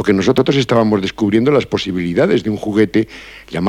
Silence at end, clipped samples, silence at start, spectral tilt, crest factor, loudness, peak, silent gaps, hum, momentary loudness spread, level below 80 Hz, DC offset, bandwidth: 0 s; under 0.1%; 0 s; -6.5 dB/octave; 14 dB; -15 LUFS; -2 dBFS; none; none; 6 LU; -46 dBFS; under 0.1%; 13.5 kHz